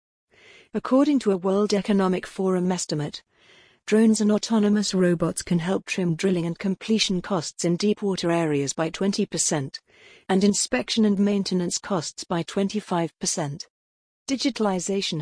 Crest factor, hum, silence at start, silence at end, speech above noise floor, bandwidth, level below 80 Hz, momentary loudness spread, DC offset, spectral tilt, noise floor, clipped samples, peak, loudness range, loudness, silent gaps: 16 dB; none; 0.75 s; 0 s; 33 dB; 10.5 kHz; -58 dBFS; 8 LU; under 0.1%; -4.5 dB/octave; -56 dBFS; under 0.1%; -8 dBFS; 3 LU; -24 LUFS; 13.70-14.26 s